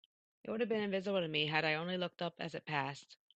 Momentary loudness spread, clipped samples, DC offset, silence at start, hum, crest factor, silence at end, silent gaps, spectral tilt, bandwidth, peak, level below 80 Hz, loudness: 11 LU; under 0.1%; under 0.1%; 0.45 s; none; 20 dB; 0.25 s; none; -5.5 dB/octave; 8.6 kHz; -18 dBFS; -80 dBFS; -37 LUFS